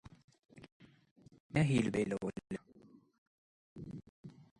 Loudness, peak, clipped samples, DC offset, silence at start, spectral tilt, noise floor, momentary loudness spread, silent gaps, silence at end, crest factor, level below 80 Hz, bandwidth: -36 LUFS; -20 dBFS; under 0.1%; under 0.1%; 0.05 s; -7 dB/octave; -63 dBFS; 25 LU; 0.24-0.28 s, 0.72-0.80 s, 1.11-1.16 s, 1.40-1.50 s, 3.18-3.76 s, 4.09-4.24 s; 0.3 s; 22 dB; -66 dBFS; 11.5 kHz